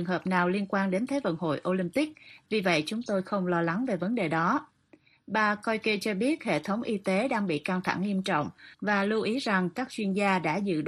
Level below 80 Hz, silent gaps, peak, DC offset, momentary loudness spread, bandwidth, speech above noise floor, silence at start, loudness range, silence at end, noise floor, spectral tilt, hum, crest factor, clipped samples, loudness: -70 dBFS; none; -10 dBFS; under 0.1%; 5 LU; 13 kHz; 33 dB; 0 s; 1 LU; 0 s; -61 dBFS; -6 dB/octave; none; 18 dB; under 0.1%; -29 LUFS